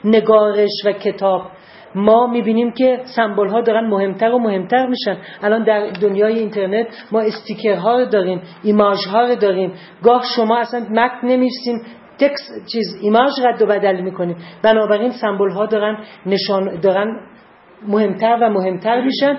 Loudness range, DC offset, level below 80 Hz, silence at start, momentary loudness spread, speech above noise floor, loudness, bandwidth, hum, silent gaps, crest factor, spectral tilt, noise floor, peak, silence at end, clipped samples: 2 LU; under 0.1%; -62 dBFS; 0.05 s; 9 LU; 29 dB; -16 LUFS; 5.8 kHz; none; none; 16 dB; -9 dB/octave; -45 dBFS; 0 dBFS; 0 s; under 0.1%